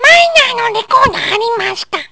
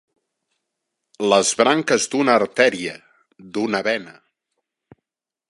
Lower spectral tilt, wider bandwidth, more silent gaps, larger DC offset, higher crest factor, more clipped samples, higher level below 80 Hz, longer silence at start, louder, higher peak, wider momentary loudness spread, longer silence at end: second, -1.5 dB/octave vs -3 dB/octave; second, 8 kHz vs 11.5 kHz; neither; neither; second, 12 dB vs 22 dB; first, 2% vs under 0.1%; first, -42 dBFS vs -70 dBFS; second, 0 s vs 1.2 s; first, -10 LUFS vs -19 LUFS; about the same, 0 dBFS vs 0 dBFS; about the same, 11 LU vs 11 LU; second, 0.05 s vs 1.4 s